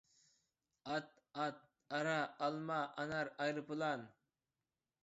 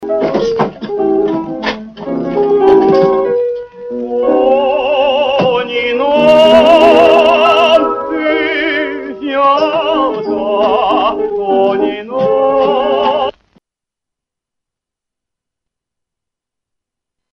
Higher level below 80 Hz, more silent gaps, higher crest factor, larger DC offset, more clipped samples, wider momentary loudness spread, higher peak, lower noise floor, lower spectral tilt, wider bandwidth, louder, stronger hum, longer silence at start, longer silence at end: second, -84 dBFS vs -46 dBFS; neither; first, 18 dB vs 12 dB; neither; second, under 0.1% vs 0.1%; about the same, 11 LU vs 12 LU; second, -24 dBFS vs 0 dBFS; first, under -90 dBFS vs -82 dBFS; second, -3.5 dB/octave vs -5.5 dB/octave; second, 7.6 kHz vs 9 kHz; second, -42 LUFS vs -11 LUFS; neither; first, 0.85 s vs 0 s; second, 0.95 s vs 4 s